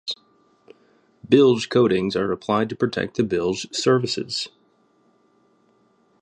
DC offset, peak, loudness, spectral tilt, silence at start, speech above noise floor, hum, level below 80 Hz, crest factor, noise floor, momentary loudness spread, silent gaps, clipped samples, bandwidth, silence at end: under 0.1%; -2 dBFS; -21 LUFS; -5 dB/octave; 0.05 s; 41 dB; none; -58 dBFS; 20 dB; -62 dBFS; 11 LU; none; under 0.1%; 10.5 kHz; 1.75 s